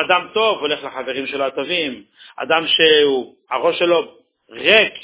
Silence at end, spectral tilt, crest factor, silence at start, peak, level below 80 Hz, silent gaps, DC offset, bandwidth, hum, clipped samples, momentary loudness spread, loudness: 0 s; -7 dB/octave; 18 dB; 0 s; 0 dBFS; -60 dBFS; none; under 0.1%; 4 kHz; none; under 0.1%; 13 LU; -17 LUFS